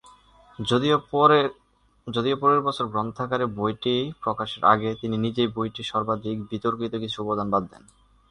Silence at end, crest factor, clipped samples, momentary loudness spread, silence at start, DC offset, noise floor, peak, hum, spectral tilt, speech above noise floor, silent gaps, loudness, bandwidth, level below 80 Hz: 0.65 s; 22 dB; under 0.1%; 10 LU; 0.6 s; under 0.1%; -53 dBFS; -2 dBFS; none; -6.5 dB/octave; 29 dB; none; -24 LUFS; 10.5 kHz; -56 dBFS